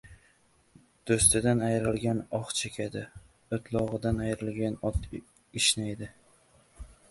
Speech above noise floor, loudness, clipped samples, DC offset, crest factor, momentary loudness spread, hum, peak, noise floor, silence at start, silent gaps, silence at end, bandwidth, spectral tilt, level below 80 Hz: 36 dB; -28 LUFS; under 0.1%; under 0.1%; 24 dB; 19 LU; none; -8 dBFS; -65 dBFS; 0.05 s; none; 0.25 s; 12 kHz; -4 dB/octave; -46 dBFS